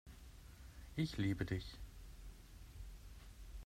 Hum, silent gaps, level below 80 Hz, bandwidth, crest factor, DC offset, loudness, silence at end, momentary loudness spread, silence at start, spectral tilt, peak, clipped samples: none; none; -56 dBFS; 16 kHz; 20 dB; under 0.1%; -44 LUFS; 0 s; 19 LU; 0.05 s; -6.5 dB/octave; -26 dBFS; under 0.1%